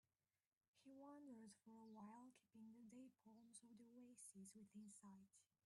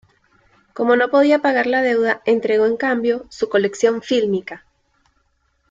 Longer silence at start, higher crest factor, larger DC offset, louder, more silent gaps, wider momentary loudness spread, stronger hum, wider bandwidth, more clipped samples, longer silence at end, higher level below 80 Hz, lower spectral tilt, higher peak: about the same, 0.75 s vs 0.75 s; about the same, 14 dB vs 16 dB; neither; second, -65 LUFS vs -18 LUFS; neither; second, 5 LU vs 9 LU; neither; first, 11.5 kHz vs 7.8 kHz; neither; second, 0.2 s vs 1.15 s; second, under -90 dBFS vs -62 dBFS; about the same, -4.5 dB/octave vs -5 dB/octave; second, -52 dBFS vs -2 dBFS